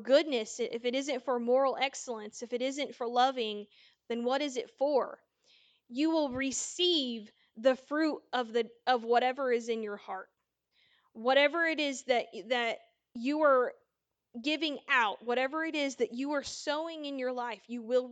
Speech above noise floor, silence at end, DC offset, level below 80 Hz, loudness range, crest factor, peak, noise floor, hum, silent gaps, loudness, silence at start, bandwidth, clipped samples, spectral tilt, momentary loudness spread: 53 dB; 0 s; under 0.1%; -76 dBFS; 3 LU; 20 dB; -12 dBFS; -84 dBFS; none; none; -31 LUFS; 0 s; 9.4 kHz; under 0.1%; -2 dB/octave; 11 LU